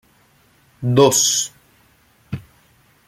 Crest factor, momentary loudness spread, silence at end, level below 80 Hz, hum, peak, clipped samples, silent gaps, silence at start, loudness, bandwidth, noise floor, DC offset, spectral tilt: 20 dB; 21 LU; 0.7 s; -56 dBFS; none; -2 dBFS; under 0.1%; none; 0.8 s; -16 LUFS; 16 kHz; -56 dBFS; under 0.1%; -3.5 dB/octave